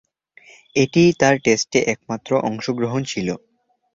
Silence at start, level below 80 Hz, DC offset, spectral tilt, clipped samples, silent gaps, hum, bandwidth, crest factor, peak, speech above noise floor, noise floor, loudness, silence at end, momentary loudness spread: 0.75 s; -56 dBFS; under 0.1%; -5 dB/octave; under 0.1%; none; none; 7.6 kHz; 18 dB; -2 dBFS; 32 dB; -50 dBFS; -19 LUFS; 0.55 s; 11 LU